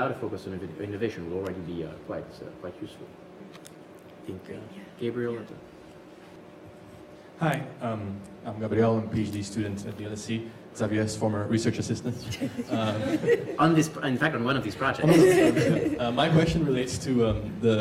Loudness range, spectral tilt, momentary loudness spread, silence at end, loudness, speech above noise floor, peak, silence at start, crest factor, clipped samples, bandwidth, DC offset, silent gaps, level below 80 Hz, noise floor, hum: 15 LU; -6 dB/octave; 24 LU; 0 s; -27 LUFS; 21 dB; -10 dBFS; 0 s; 18 dB; under 0.1%; 15.5 kHz; under 0.1%; none; -52 dBFS; -48 dBFS; none